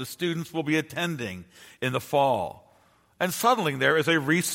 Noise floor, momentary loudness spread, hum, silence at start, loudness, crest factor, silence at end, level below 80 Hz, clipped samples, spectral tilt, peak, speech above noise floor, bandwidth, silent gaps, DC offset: -61 dBFS; 10 LU; none; 0 s; -26 LUFS; 20 dB; 0 s; -66 dBFS; under 0.1%; -4 dB/octave; -8 dBFS; 36 dB; 16.5 kHz; none; under 0.1%